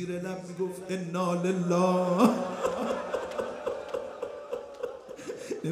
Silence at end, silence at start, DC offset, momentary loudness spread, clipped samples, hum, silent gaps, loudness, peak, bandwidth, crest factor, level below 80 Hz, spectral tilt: 0 s; 0 s; under 0.1%; 14 LU; under 0.1%; none; none; -30 LUFS; -8 dBFS; 15.5 kHz; 22 dB; -66 dBFS; -6.5 dB/octave